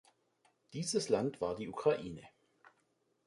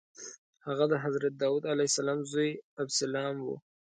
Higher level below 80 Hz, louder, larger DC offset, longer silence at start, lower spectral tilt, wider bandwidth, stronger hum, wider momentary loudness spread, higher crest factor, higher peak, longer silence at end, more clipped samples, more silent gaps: first, -70 dBFS vs -80 dBFS; second, -36 LUFS vs -31 LUFS; neither; first, 0.7 s vs 0.2 s; about the same, -4.5 dB/octave vs -4 dB/octave; first, 11.5 kHz vs 9.4 kHz; neither; about the same, 15 LU vs 16 LU; about the same, 20 dB vs 18 dB; second, -18 dBFS vs -14 dBFS; first, 1 s vs 0.4 s; neither; second, none vs 0.38-0.53 s, 2.63-2.77 s